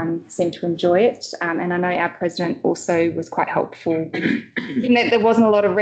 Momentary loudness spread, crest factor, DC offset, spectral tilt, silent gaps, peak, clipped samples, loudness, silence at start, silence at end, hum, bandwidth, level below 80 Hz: 8 LU; 16 dB; under 0.1%; -5.5 dB/octave; none; -2 dBFS; under 0.1%; -19 LUFS; 0 s; 0 s; none; 9 kHz; -64 dBFS